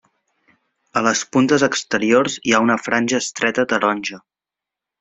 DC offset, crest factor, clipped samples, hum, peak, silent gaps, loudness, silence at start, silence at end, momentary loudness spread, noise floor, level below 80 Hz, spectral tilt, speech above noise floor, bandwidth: under 0.1%; 18 dB; under 0.1%; none; -2 dBFS; none; -18 LUFS; 0.95 s; 0.8 s; 5 LU; -87 dBFS; -60 dBFS; -3.5 dB/octave; 69 dB; 8.2 kHz